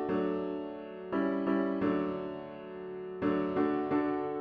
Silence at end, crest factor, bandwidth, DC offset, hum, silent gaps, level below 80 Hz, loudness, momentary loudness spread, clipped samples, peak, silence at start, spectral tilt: 0 s; 14 dB; 4.9 kHz; under 0.1%; none; none; -66 dBFS; -33 LUFS; 12 LU; under 0.1%; -18 dBFS; 0 s; -9.5 dB/octave